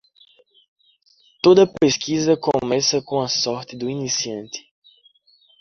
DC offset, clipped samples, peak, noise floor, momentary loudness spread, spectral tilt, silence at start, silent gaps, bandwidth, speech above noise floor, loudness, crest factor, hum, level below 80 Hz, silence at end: under 0.1%; under 0.1%; -2 dBFS; -58 dBFS; 14 LU; -4 dB/octave; 1.45 s; none; 7.2 kHz; 39 dB; -19 LUFS; 20 dB; none; -58 dBFS; 1 s